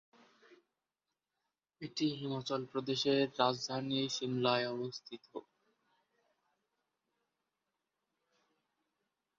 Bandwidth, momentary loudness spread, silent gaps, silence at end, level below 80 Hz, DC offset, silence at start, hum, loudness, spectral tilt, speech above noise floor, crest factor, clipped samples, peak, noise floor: 7.4 kHz; 16 LU; none; 4 s; -82 dBFS; under 0.1%; 0.5 s; none; -35 LUFS; -3.5 dB/octave; over 54 dB; 24 dB; under 0.1%; -16 dBFS; under -90 dBFS